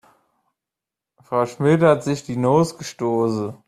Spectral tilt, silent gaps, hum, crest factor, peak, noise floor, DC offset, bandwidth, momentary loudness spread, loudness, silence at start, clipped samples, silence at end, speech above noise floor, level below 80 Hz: -7 dB/octave; none; none; 20 dB; -2 dBFS; -87 dBFS; under 0.1%; 13.5 kHz; 9 LU; -20 LUFS; 1.3 s; under 0.1%; 0.15 s; 68 dB; -60 dBFS